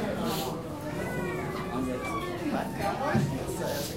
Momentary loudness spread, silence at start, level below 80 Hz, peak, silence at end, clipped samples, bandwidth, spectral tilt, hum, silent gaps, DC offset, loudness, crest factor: 6 LU; 0 s; -50 dBFS; -12 dBFS; 0 s; under 0.1%; 16 kHz; -5.5 dB/octave; none; none; 0.1%; -32 LUFS; 18 dB